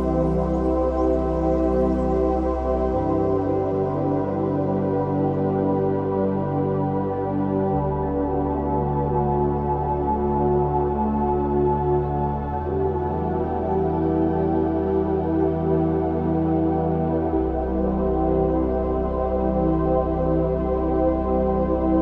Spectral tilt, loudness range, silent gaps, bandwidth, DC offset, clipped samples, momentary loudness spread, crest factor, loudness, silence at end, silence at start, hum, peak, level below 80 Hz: -11 dB/octave; 1 LU; none; 5.6 kHz; under 0.1%; under 0.1%; 3 LU; 12 dB; -22 LUFS; 0 s; 0 s; none; -8 dBFS; -32 dBFS